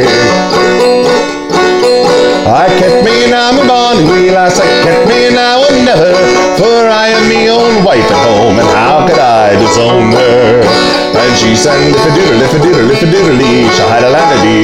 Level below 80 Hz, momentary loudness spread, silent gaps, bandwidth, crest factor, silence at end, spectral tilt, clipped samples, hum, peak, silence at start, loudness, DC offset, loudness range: -34 dBFS; 1 LU; none; 14 kHz; 6 dB; 0 s; -4.5 dB/octave; 0.3%; none; 0 dBFS; 0 s; -6 LUFS; under 0.1%; 1 LU